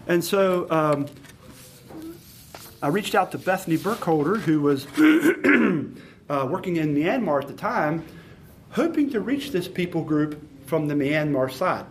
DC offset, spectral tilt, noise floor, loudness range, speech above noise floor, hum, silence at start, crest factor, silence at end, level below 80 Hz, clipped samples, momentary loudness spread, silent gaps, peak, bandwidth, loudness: under 0.1%; -6 dB/octave; -47 dBFS; 5 LU; 24 dB; none; 0 s; 18 dB; 0 s; -60 dBFS; under 0.1%; 17 LU; none; -6 dBFS; 15.5 kHz; -23 LUFS